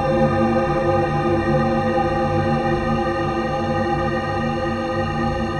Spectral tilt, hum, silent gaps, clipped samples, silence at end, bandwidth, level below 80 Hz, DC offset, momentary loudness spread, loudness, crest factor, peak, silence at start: -7.5 dB/octave; none; none; under 0.1%; 0 s; 10.5 kHz; -36 dBFS; under 0.1%; 4 LU; -20 LUFS; 14 dB; -6 dBFS; 0 s